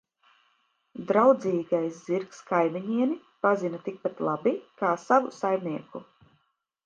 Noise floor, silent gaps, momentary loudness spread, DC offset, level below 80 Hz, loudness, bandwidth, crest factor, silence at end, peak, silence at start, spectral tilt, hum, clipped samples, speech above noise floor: -74 dBFS; none; 13 LU; under 0.1%; -78 dBFS; -27 LUFS; 7.6 kHz; 20 dB; 0.85 s; -6 dBFS; 0.95 s; -7 dB/octave; none; under 0.1%; 47 dB